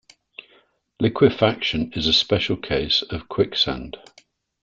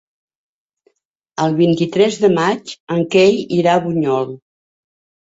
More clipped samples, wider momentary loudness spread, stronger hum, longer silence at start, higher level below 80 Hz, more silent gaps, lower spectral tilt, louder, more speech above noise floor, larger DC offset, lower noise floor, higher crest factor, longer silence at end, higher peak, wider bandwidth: neither; about the same, 11 LU vs 9 LU; neither; second, 1 s vs 1.4 s; first, -46 dBFS vs -60 dBFS; second, none vs 2.80-2.87 s; about the same, -5.5 dB/octave vs -6 dB/octave; second, -20 LUFS vs -16 LUFS; second, 38 dB vs 48 dB; neither; second, -59 dBFS vs -63 dBFS; about the same, 20 dB vs 16 dB; second, 0.65 s vs 0.85 s; about the same, -2 dBFS vs -2 dBFS; about the same, 7.6 kHz vs 8 kHz